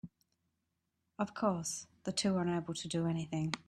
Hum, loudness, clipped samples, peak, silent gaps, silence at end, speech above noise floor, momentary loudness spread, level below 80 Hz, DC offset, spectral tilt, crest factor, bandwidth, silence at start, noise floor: none; -36 LUFS; under 0.1%; -16 dBFS; none; 0.1 s; 48 dB; 8 LU; -72 dBFS; under 0.1%; -5 dB/octave; 22 dB; 13.5 kHz; 0.05 s; -84 dBFS